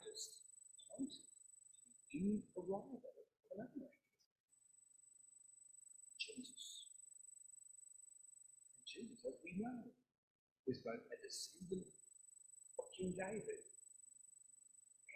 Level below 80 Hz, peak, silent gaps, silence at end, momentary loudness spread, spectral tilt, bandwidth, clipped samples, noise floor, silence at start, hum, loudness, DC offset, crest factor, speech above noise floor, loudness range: -82 dBFS; -30 dBFS; 4.26-4.48 s, 10.18-10.64 s; 0 s; 16 LU; -4 dB/octave; 14.5 kHz; under 0.1%; -72 dBFS; 0 s; none; -51 LUFS; under 0.1%; 22 dB; 24 dB; 6 LU